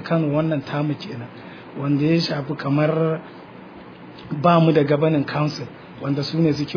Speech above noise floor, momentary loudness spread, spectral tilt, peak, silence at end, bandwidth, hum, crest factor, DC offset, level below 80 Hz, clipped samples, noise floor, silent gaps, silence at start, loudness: 20 dB; 23 LU; -8 dB/octave; -4 dBFS; 0 s; 5.4 kHz; none; 18 dB; under 0.1%; -58 dBFS; under 0.1%; -40 dBFS; none; 0 s; -21 LUFS